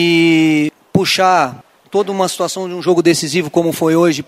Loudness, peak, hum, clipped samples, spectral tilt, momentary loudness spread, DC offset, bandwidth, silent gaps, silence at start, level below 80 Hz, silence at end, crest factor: -14 LUFS; 0 dBFS; none; under 0.1%; -4.5 dB/octave; 8 LU; under 0.1%; 15.5 kHz; none; 0 s; -58 dBFS; 0.05 s; 14 dB